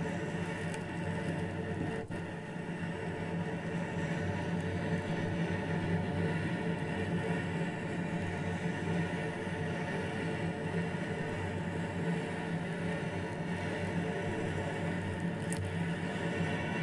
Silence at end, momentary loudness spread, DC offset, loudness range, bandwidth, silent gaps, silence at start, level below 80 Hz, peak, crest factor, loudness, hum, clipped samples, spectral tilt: 0 s; 3 LU; under 0.1%; 3 LU; 11.5 kHz; none; 0 s; -62 dBFS; -18 dBFS; 18 dB; -36 LUFS; none; under 0.1%; -6.5 dB/octave